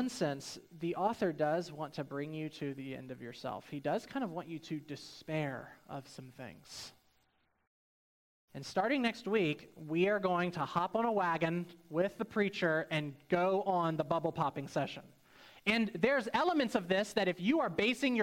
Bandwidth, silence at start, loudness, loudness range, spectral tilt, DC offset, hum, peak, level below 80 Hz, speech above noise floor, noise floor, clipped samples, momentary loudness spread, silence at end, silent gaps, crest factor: 16 kHz; 0 s; -35 LUFS; 10 LU; -5.5 dB/octave; under 0.1%; none; -16 dBFS; -72 dBFS; 41 dB; -76 dBFS; under 0.1%; 16 LU; 0 s; 7.67-8.48 s; 20 dB